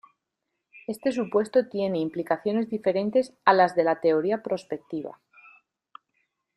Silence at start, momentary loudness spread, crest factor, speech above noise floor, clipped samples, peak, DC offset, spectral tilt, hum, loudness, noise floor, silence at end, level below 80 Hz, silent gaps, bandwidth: 0.75 s; 14 LU; 22 dB; 57 dB; under 0.1%; -4 dBFS; under 0.1%; -6.5 dB/octave; none; -25 LUFS; -82 dBFS; 1.45 s; -72 dBFS; none; 12.5 kHz